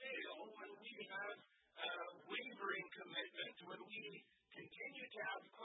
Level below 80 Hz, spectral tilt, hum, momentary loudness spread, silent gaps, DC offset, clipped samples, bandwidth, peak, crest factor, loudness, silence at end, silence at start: under -90 dBFS; 2 dB/octave; none; 12 LU; none; under 0.1%; under 0.1%; 3.9 kHz; -30 dBFS; 20 dB; -50 LUFS; 0 s; 0 s